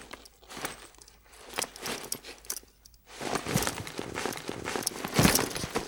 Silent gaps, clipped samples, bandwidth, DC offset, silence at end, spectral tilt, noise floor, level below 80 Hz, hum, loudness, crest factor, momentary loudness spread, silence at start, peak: none; under 0.1%; over 20 kHz; under 0.1%; 0 s; -3.5 dB/octave; -57 dBFS; -50 dBFS; none; -31 LUFS; 26 dB; 22 LU; 0 s; -6 dBFS